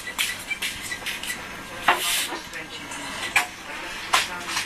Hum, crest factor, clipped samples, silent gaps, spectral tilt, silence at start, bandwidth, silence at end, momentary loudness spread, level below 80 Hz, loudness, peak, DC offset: none; 26 dB; under 0.1%; none; -0.5 dB/octave; 0 s; 14 kHz; 0 s; 11 LU; -54 dBFS; -26 LUFS; -2 dBFS; under 0.1%